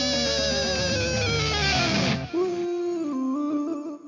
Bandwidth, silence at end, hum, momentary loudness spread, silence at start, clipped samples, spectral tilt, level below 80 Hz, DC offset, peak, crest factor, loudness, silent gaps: 7.6 kHz; 0 s; none; 6 LU; 0 s; under 0.1%; -4 dB/octave; -40 dBFS; under 0.1%; -12 dBFS; 14 dB; -24 LUFS; none